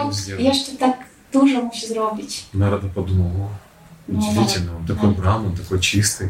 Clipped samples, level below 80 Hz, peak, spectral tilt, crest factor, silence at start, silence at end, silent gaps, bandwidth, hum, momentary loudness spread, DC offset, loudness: under 0.1%; -42 dBFS; -2 dBFS; -5 dB/octave; 18 dB; 0 s; 0 s; none; 16.5 kHz; none; 10 LU; under 0.1%; -20 LUFS